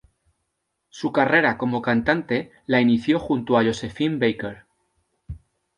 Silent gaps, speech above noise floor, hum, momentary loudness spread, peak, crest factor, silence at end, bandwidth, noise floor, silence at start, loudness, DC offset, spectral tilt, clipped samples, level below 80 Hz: none; 56 dB; none; 16 LU; -4 dBFS; 20 dB; 0.4 s; 10.5 kHz; -77 dBFS; 0.95 s; -21 LUFS; under 0.1%; -6.5 dB/octave; under 0.1%; -52 dBFS